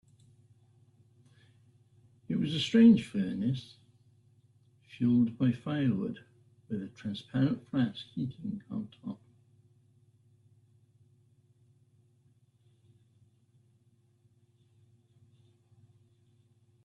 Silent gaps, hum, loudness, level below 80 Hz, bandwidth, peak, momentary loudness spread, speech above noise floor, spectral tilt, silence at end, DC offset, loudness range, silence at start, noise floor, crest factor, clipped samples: none; none; -30 LUFS; -70 dBFS; 11 kHz; -12 dBFS; 20 LU; 39 dB; -7.5 dB/octave; 7.7 s; under 0.1%; 15 LU; 2.3 s; -68 dBFS; 22 dB; under 0.1%